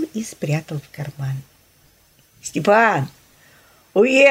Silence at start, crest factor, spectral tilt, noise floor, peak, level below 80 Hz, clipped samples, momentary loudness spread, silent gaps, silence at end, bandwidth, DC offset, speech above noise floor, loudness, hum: 0 s; 18 dB; -5.5 dB/octave; -55 dBFS; -2 dBFS; -62 dBFS; under 0.1%; 17 LU; none; 0 s; 16 kHz; under 0.1%; 37 dB; -19 LUFS; none